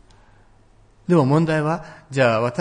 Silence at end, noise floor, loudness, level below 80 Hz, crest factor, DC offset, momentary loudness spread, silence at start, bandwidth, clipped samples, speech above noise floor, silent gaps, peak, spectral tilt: 0 s; -52 dBFS; -20 LUFS; -54 dBFS; 16 dB; under 0.1%; 12 LU; 1.1 s; 10 kHz; under 0.1%; 34 dB; none; -4 dBFS; -7.5 dB/octave